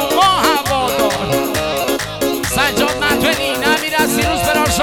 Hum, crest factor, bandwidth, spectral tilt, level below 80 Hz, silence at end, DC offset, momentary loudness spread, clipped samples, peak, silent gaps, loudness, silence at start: none; 14 dB; over 20 kHz; -3 dB/octave; -34 dBFS; 0 s; under 0.1%; 5 LU; under 0.1%; 0 dBFS; none; -15 LUFS; 0 s